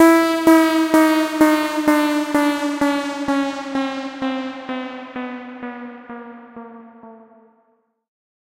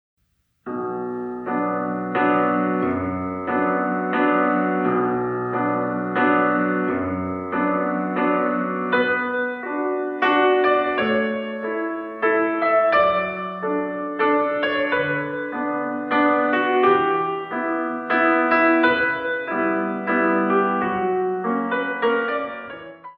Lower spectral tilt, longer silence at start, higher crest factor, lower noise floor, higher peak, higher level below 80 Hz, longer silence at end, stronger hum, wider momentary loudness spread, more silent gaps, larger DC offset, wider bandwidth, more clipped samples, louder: second, -3.5 dB/octave vs -8.5 dB/octave; second, 0 s vs 0.65 s; about the same, 16 dB vs 16 dB; first, -63 dBFS vs -52 dBFS; about the same, -2 dBFS vs -4 dBFS; about the same, -58 dBFS vs -60 dBFS; first, 1.3 s vs 0.05 s; neither; first, 22 LU vs 9 LU; neither; neither; first, 16 kHz vs 5.6 kHz; neither; first, -18 LUFS vs -21 LUFS